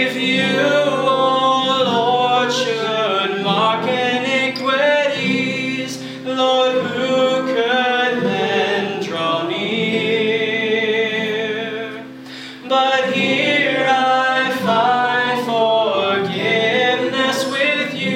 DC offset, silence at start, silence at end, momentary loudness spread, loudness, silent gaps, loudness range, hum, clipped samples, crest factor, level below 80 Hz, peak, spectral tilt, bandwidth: under 0.1%; 0 s; 0 s; 6 LU; -17 LUFS; none; 3 LU; none; under 0.1%; 14 dB; -68 dBFS; -2 dBFS; -4 dB/octave; 16 kHz